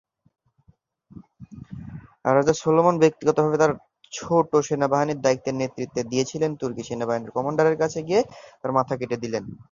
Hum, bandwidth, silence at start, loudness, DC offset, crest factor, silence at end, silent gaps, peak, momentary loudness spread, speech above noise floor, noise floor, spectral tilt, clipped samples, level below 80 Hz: none; 7.4 kHz; 1.15 s; -23 LUFS; under 0.1%; 20 dB; 0.1 s; none; -4 dBFS; 16 LU; 39 dB; -61 dBFS; -5.5 dB/octave; under 0.1%; -58 dBFS